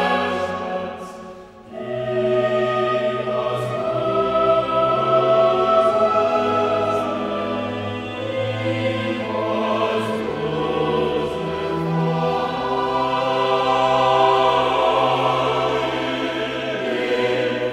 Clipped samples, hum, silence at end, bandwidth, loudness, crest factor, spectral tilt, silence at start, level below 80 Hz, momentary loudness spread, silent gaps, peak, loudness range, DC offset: under 0.1%; none; 0 s; 12.5 kHz; -20 LUFS; 16 dB; -6 dB/octave; 0 s; -50 dBFS; 9 LU; none; -4 dBFS; 5 LU; under 0.1%